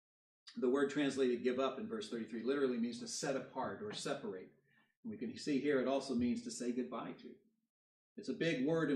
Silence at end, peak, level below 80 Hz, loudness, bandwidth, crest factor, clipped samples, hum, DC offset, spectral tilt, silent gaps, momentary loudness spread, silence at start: 0 s; -22 dBFS; -80 dBFS; -39 LUFS; 11.5 kHz; 16 dB; under 0.1%; none; under 0.1%; -5 dB/octave; 4.97-5.03 s, 7.70-8.16 s; 15 LU; 0.45 s